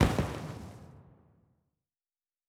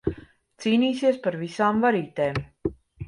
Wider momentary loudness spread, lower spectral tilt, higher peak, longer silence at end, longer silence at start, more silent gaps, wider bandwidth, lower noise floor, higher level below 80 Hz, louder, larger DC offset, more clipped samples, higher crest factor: first, 24 LU vs 12 LU; about the same, -6.5 dB/octave vs -6.5 dB/octave; about the same, -10 dBFS vs -10 dBFS; first, 1.45 s vs 0 s; about the same, 0 s vs 0.05 s; neither; first, 17 kHz vs 11 kHz; first, under -90 dBFS vs -47 dBFS; about the same, -44 dBFS vs -48 dBFS; second, -35 LUFS vs -25 LUFS; neither; neither; first, 26 dB vs 16 dB